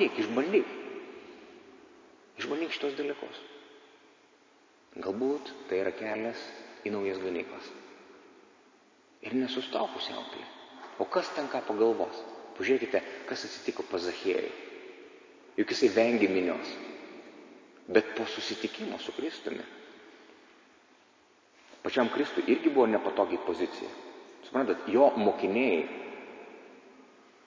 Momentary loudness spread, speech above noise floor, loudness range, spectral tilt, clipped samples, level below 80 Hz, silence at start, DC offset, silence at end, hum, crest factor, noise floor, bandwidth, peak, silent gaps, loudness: 23 LU; 33 dB; 9 LU; -4.5 dB/octave; under 0.1%; -74 dBFS; 0 s; under 0.1%; 0.45 s; none; 24 dB; -63 dBFS; 7.6 kHz; -8 dBFS; none; -31 LUFS